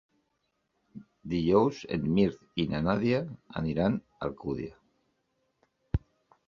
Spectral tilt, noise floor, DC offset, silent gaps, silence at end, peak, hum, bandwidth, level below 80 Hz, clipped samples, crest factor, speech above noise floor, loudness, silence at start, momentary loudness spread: -8 dB/octave; -78 dBFS; under 0.1%; none; 0.5 s; -10 dBFS; none; 7 kHz; -48 dBFS; under 0.1%; 20 dB; 49 dB; -30 LUFS; 0.95 s; 12 LU